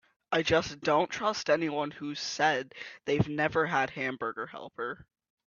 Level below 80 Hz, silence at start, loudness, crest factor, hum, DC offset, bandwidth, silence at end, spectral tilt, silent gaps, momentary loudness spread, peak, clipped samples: -62 dBFS; 0.3 s; -30 LUFS; 20 dB; none; under 0.1%; 7.4 kHz; 0.45 s; -4.5 dB/octave; none; 11 LU; -10 dBFS; under 0.1%